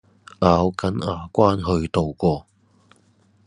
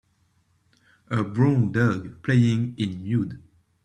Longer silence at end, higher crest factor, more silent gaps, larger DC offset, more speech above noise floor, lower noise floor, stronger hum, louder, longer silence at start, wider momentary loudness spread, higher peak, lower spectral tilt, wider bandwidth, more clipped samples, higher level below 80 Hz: first, 1.05 s vs 0.45 s; about the same, 22 dB vs 18 dB; neither; neither; second, 38 dB vs 43 dB; second, -58 dBFS vs -66 dBFS; neither; first, -21 LUFS vs -24 LUFS; second, 0.4 s vs 1.1 s; about the same, 7 LU vs 9 LU; first, 0 dBFS vs -8 dBFS; about the same, -7.5 dB/octave vs -8 dB/octave; first, 10.5 kHz vs 9.2 kHz; neither; first, -48 dBFS vs -58 dBFS